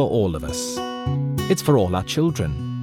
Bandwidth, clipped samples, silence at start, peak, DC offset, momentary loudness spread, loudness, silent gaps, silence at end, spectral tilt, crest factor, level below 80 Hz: 18 kHz; under 0.1%; 0 s; -6 dBFS; under 0.1%; 8 LU; -22 LUFS; none; 0 s; -6 dB/octave; 16 dB; -42 dBFS